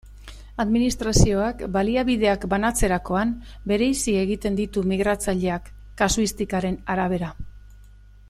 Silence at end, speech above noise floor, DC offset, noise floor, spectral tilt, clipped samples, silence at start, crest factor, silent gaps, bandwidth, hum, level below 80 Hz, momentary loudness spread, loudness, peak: 0.45 s; 25 dB; under 0.1%; -47 dBFS; -5 dB/octave; under 0.1%; 0.05 s; 22 dB; none; 15 kHz; 50 Hz at -40 dBFS; -34 dBFS; 7 LU; -23 LUFS; -2 dBFS